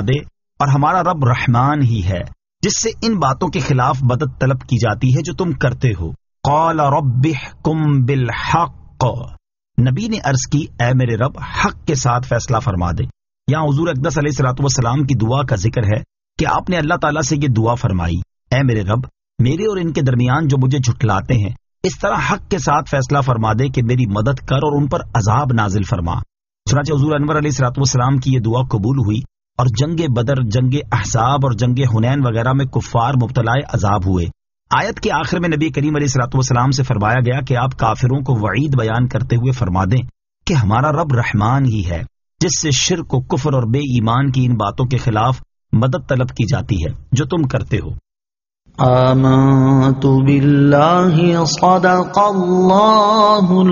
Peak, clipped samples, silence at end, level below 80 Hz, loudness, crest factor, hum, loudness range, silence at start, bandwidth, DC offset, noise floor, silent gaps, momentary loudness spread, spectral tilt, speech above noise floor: 0 dBFS; under 0.1%; 0 s; -36 dBFS; -16 LUFS; 16 dB; none; 5 LU; 0 s; 7.4 kHz; under 0.1%; under -90 dBFS; none; 8 LU; -6 dB/octave; over 75 dB